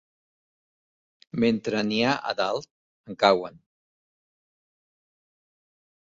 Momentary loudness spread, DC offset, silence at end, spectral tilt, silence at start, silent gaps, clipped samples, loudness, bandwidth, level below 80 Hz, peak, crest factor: 14 LU; under 0.1%; 2.6 s; -5 dB/octave; 1.35 s; 2.71-3.04 s; under 0.1%; -25 LUFS; 7.8 kHz; -66 dBFS; -4 dBFS; 24 dB